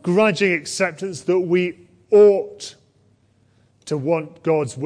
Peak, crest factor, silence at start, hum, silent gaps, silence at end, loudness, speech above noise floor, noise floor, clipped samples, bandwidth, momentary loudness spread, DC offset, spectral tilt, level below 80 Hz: -4 dBFS; 16 dB; 0.05 s; none; none; 0 s; -19 LUFS; 40 dB; -59 dBFS; under 0.1%; 10.5 kHz; 14 LU; under 0.1%; -5.5 dB/octave; -66 dBFS